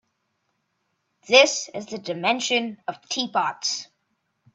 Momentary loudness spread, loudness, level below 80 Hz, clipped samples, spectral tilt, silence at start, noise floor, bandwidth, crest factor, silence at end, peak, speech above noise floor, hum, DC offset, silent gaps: 16 LU; -22 LUFS; -76 dBFS; under 0.1%; -1.5 dB/octave; 1.3 s; -74 dBFS; 8.4 kHz; 24 dB; 0.7 s; -2 dBFS; 51 dB; none; under 0.1%; none